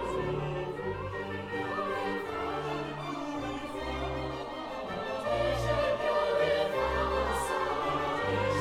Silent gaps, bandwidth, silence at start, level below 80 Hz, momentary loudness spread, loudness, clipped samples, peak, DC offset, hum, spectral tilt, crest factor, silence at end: none; 16 kHz; 0 s; -46 dBFS; 8 LU; -32 LUFS; under 0.1%; -18 dBFS; under 0.1%; none; -5.5 dB/octave; 14 dB; 0 s